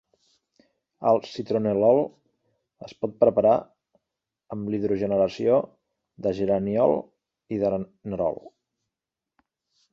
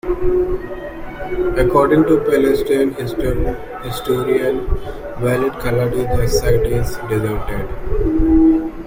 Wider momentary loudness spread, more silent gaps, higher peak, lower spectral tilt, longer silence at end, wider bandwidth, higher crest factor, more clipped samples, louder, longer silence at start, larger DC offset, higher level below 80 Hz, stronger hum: about the same, 13 LU vs 13 LU; neither; second, -6 dBFS vs -2 dBFS; first, -8.5 dB/octave vs -7 dB/octave; first, 1.45 s vs 0 s; second, 7.2 kHz vs 16.5 kHz; first, 20 dB vs 14 dB; neither; second, -24 LUFS vs -17 LUFS; first, 1 s vs 0.05 s; neither; second, -60 dBFS vs -26 dBFS; neither